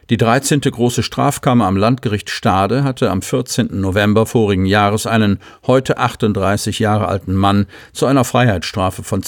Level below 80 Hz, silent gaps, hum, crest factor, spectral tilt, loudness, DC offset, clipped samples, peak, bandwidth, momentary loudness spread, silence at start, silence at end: -44 dBFS; none; none; 14 dB; -5.5 dB/octave; -15 LUFS; under 0.1%; under 0.1%; 0 dBFS; 20 kHz; 5 LU; 0.1 s; 0 s